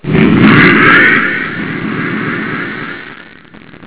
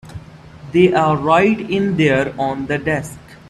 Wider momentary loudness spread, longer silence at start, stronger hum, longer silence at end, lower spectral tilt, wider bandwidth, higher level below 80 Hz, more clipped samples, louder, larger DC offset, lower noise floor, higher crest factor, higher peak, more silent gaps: first, 17 LU vs 12 LU; about the same, 0.05 s vs 0.05 s; neither; second, 0 s vs 0.15 s; first, -9.5 dB/octave vs -6.5 dB/octave; second, 4 kHz vs 12.5 kHz; first, -38 dBFS vs -46 dBFS; first, 1% vs under 0.1%; first, -8 LUFS vs -16 LUFS; neither; about the same, -36 dBFS vs -38 dBFS; second, 10 dB vs 16 dB; about the same, 0 dBFS vs -2 dBFS; neither